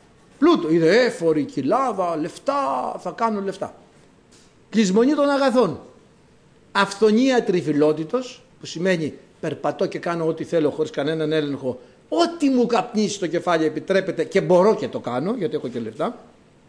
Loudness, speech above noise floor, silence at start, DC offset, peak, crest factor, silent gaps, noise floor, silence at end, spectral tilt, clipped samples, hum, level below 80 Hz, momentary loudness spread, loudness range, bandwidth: -21 LUFS; 32 dB; 0.4 s; under 0.1%; -6 dBFS; 16 dB; none; -53 dBFS; 0.45 s; -5.5 dB/octave; under 0.1%; none; -64 dBFS; 11 LU; 4 LU; 10.5 kHz